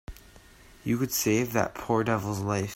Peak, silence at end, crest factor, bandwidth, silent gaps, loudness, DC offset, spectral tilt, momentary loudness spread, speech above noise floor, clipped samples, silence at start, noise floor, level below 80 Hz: -10 dBFS; 0 s; 18 dB; 16.5 kHz; none; -27 LUFS; under 0.1%; -5 dB/octave; 7 LU; 26 dB; under 0.1%; 0.1 s; -53 dBFS; -52 dBFS